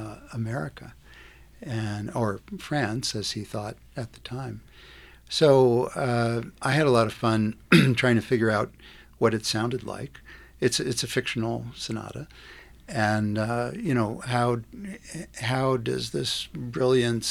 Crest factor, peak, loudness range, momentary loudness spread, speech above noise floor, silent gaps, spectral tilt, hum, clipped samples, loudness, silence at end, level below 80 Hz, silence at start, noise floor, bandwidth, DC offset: 24 dB; -2 dBFS; 9 LU; 17 LU; 24 dB; none; -5.5 dB/octave; none; under 0.1%; -26 LUFS; 0 s; -54 dBFS; 0 s; -50 dBFS; 15.5 kHz; under 0.1%